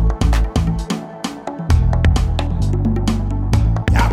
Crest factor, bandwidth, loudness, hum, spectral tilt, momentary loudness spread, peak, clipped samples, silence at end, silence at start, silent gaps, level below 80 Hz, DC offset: 14 dB; 12.5 kHz; -18 LUFS; none; -6.5 dB/octave; 9 LU; -2 dBFS; under 0.1%; 0 s; 0 s; none; -18 dBFS; under 0.1%